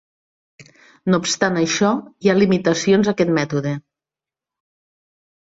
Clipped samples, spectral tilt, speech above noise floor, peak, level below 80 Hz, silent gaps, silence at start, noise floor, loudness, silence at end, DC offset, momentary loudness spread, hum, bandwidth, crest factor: under 0.1%; -5 dB/octave; 72 dB; -2 dBFS; -58 dBFS; none; 0.6 s; -89 dBFS; -18 LUFS; 1.75 s; under 0.1%; 8 LU; none; 8 kHz; 18 dB